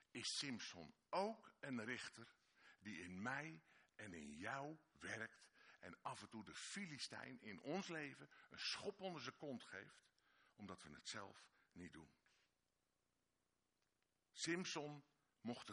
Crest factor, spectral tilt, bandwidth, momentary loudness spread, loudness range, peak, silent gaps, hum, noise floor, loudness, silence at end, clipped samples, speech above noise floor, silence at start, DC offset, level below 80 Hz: 22 dB; -3.5 dB/octave; 10.5 kHz; 17 LU; 9 LU; -32 dBFS; none; none; -90 dBFS; -51 LUFS; 0 s; under 0.1%; 38 dB; 0 s; under 0.1%; -86 dBFS